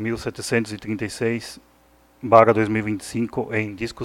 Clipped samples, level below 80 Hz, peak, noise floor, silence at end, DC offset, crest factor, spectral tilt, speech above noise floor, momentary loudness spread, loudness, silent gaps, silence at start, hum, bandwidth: under 0.1%; -52 dBFS; 0 dBFS; -56 dBFS; 0 s; under 0.1%; 22 dB; -6 dB/octave; 34 dB; 14 LU; -21 LUFS; none; 0 s; none; 16.5 kHz